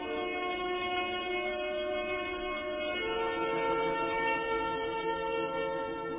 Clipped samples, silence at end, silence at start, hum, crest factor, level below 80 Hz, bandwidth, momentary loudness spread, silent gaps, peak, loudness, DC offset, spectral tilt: under 0.1%; 0 s; 0 s; none; 12 dB; -58 dBFS; 3.8 kHz; 4 LU; none; -20 dBFS; -33 LUFS; under 0.1%; -1.5 dB/octave